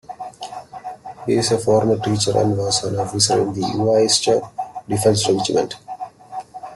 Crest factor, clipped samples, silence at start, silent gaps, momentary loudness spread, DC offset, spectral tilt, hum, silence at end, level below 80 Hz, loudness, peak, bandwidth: 18 dB; under 0.1%; 0.1 s; none; 17 LU; under 0.1%; -4 dB/octave; none; 0 s; -52 dBFS; -18 LUFS; -2 dBFS; 12.5 kHz